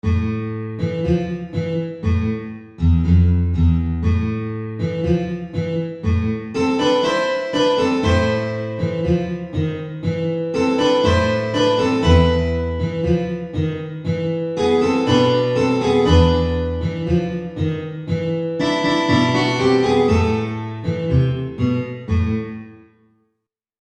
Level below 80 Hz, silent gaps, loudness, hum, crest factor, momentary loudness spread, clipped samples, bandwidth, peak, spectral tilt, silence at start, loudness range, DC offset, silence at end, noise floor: -30 dBFS; none; -19 LUFS; none; 18 dB; 9 LU; under 0.1%; 9 kHz; -2 dBFS; -7 dB/octave; 0.05 s; 3 LU; under 0.1%; 1.05 s; -76 dBFS